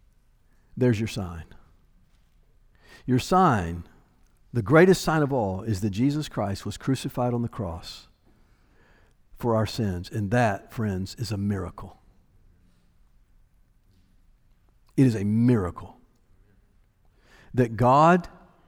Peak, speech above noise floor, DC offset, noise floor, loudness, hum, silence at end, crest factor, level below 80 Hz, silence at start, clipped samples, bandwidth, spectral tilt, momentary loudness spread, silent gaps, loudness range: -6 dBFS; 37 dB; under 0.1%; -61 dBFS; -24 LUFS; none; 0.4 s; 22 dB; -50 dBFS; 0.75 s; under 0.1%; over 20 kHz; -7 dB/octave; 19 LU; none; 9 LU